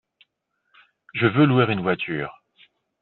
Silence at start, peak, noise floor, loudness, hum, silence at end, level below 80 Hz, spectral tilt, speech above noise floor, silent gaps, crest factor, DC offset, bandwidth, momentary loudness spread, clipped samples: 1.15 s; -4 dBFS; -74 dBFS; -21 LUFS; none; 0.7 s; -62 dBFS; -5.5 dB/octave; 54 dB; none; 20 dB; under 0.1%; 4.3 kHz; 14 LU; under 0.1%